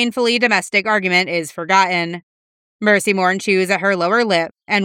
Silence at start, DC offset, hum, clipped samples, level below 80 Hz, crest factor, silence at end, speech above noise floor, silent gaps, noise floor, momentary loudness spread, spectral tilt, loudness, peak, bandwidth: 0 s; under 0.1%; none; under 0.1%; -72 dBFS; 16 dB; 0 s; over 73 dB; 2.23-2.79 s; under -90 dBFS; 6 LU; -4 dB/octave; -16 LUFS; 0 dBFS; 16.5 kHz